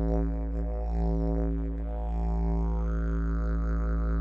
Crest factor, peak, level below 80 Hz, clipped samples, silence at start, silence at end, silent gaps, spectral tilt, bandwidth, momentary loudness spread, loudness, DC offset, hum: 12 dB; -14 dBFS; -28 dBFS; under 0.1%; 0 s; 0 s; none; -10.5 dB/octave; 2.5 kHz; 4 LU; -31 LUFS; under 0.1%; none